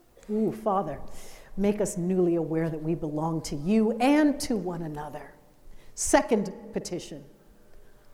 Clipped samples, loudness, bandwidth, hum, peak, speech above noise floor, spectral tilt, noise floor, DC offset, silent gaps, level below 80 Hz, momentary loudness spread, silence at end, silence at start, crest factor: under 0.1%; -27 LUFS; 16.5 kHz; none; -8 dBFS; 24 dB; -5.5 dB/octave; -50 dBFS; under 0.1%; none; -48 dBFS; 19 LU; 0.05 s; 0.3 s; 20 dB